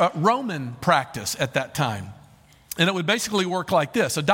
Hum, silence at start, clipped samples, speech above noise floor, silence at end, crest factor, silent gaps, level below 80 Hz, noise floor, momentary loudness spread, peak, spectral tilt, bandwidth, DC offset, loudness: none; 0 s; under 0.1%; 29 dB; 0 s; 20 dB; none; -58 dBFS; -52 dBFS; 8 LU; -4 dBFS; -4 dB/octave; 17 kHz; under 0.1%; -23 LUFS